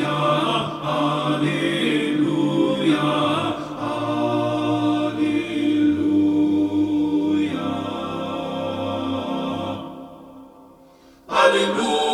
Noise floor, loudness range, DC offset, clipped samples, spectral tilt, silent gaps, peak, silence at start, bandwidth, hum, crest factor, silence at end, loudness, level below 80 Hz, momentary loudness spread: -50 dBFS; 7 LU; under 0.1%; under 0.1%; -5.5 dB/octave; none; -2 dBFS; 0 s; 11.5 kHz; none; 18 dB; 0 s; -21 LUFS; -58 dBFS; 8 LU